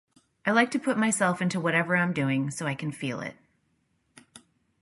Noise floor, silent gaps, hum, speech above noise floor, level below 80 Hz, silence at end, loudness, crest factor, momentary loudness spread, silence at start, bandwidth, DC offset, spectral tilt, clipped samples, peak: -72 dBFS; none; none; 46 dB; -72 dBFS; 0.45 s; -26 LUFS; 20 dB; 9 LU; 0.45 s; 11.5 kHz; under 0.1%; -5 dB/octave; under 0.1%; -10 dBFS